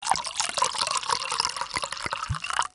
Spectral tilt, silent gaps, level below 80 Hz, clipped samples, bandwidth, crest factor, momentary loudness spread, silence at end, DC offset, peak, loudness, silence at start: -0.5 dB/octave; none; -52 dBFS; under 0.1%; 11 kHz; 22 dB; 5 LU; 0.05 s; under 0.1%; -6 dBFS; -27 LUFS; 0 s